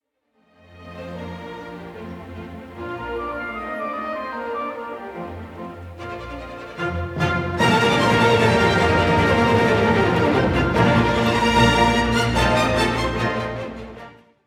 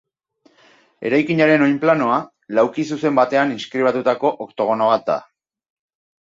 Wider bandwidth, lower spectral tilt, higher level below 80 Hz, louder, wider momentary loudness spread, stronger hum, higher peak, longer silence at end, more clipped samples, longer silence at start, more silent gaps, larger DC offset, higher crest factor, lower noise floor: first, 16 kHz vs 7.6 kHz; about the same, -5.5 dB/octave vs -6.5 dB/octave; first, -36 dBFS vs -66 dBFS; about the same, -19 LUFS vs -18 LUFS; first, 19 LU vs 8 LU; neither; about the same, -4 dBFS vs -2 dBFS; second, 0.35 s vs 1 s; neither; second, 0.75 s vs 1 s; neither; neither; about the same, 18 dB vs 18 dB; first, -65 dBFS vs -59 dBFS